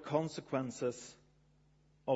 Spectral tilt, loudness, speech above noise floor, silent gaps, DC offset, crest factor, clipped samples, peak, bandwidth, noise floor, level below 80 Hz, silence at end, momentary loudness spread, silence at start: -6 dB/octave; -39 LUFS; 31 dB; none; under 0.1%; 22 dB; under 0.1%; -18 dBFS; 8 kHz; -69 dBFS; -74 dBFS; 0 s; 13 LU; 0 s